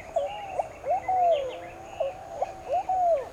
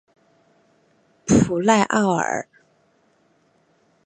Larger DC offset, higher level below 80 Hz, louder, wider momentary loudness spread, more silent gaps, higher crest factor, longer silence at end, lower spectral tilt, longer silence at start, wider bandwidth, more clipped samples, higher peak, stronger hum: neither; second, -56 dBFS vs -48 dBFS; second, -29 LUFS vs -19 LUFS; second, 10 LU vs 15 LU; neither; second, 14 dB vs 20 dB; second, 0 s vs 1.65 s; about the same, -4.5 dB/octave vs -5 dB/octave; second, 0 s vs 1.25 s; first, 11 kHz vs 9.4 kHz; neither; second, -14 dBFS vs -2 dBFS; neither